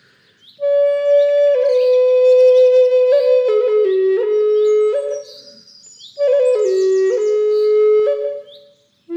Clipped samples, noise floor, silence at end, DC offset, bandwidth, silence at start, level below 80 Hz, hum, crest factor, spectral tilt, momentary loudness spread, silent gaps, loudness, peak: under 0.1%; -50 dBFS; 0 s; under 0.1%; 8.6 kHz; 0.6 s; -80 dBFS; none; 10 dB; -3 dB/octave; 9 LU; none; -14 LUFS; -4 dBFS